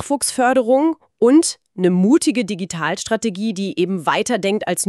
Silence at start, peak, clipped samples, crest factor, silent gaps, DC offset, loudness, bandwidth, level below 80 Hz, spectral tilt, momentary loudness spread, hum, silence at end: 0 s; -4 dBFS; under 0.1%; 14 dB; none; under 0.1%; -18 LUFS; 13.5 kHz; -60 dBFS; -4.5 dB/octave; 8 LU; none; 0 s